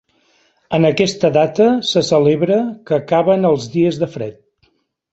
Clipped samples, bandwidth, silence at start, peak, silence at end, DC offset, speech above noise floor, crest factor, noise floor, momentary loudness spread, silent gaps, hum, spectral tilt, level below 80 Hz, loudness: under 0.1%; 8.2 kHz; 0.7 s; 0 dBFS; 0.8 s; under 0.1%; 47 dB; 16 dB; -61 dBFS; 8 LU; none; none; -6 dB/octave; -54 dBFS; -15 LUFS